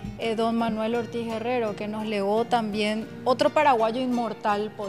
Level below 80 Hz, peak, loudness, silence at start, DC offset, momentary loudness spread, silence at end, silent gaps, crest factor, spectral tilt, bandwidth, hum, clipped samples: -56 dBFS; -8 dBFS; -25 LUFS; 0 s; 0.1%; 8 LU; 0 s; none; 16 dB; -5.5 dB/octave; 14.5 kHz; none; under 0.1%